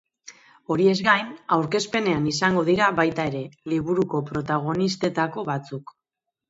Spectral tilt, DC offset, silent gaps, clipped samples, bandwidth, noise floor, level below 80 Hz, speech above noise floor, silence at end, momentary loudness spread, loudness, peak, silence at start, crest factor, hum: -5.5 dB/octave; under 0.1%; none; under 0.1%; 8 kHz; -84 dBFS; -58 dBFS; 62 dB; 0.65 s; 9 LU; -23 LUFS; -4 dBFS; 0.25 s; 20 dB; none